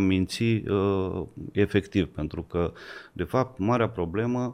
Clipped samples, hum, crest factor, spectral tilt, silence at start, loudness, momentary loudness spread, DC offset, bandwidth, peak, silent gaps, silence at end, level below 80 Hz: under 0.1%; none; 18 dB; -7 dB/octave; 0 s; -27 LUFS; 9 LU; under 0.1%; 15 kHz; -10 dBFS; none; 0 s; -48 dBFS